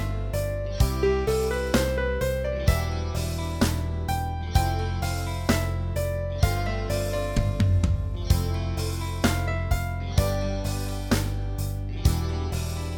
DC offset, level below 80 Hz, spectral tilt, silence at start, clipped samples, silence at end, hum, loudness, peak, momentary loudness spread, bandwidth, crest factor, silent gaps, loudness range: under 0.1%; -30 dBFS; -5.5 dB/octave; 0 s; under 0.1%; 0 s; none; -27 LUFS; -6 dBFS; 5 LU; 19 kHz; 18 dB; none; 2 LU